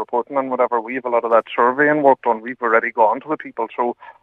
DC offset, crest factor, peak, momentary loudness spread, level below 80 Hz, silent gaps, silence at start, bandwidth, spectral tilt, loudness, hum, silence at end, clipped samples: under 0.1%; 18 dB; 0 dBFS; 9 LU; -76 dBFS; none; 0 s; 4 kHz; -7.5 dB/octave; -18 LUFS; none; 0.1 s; under 0.1%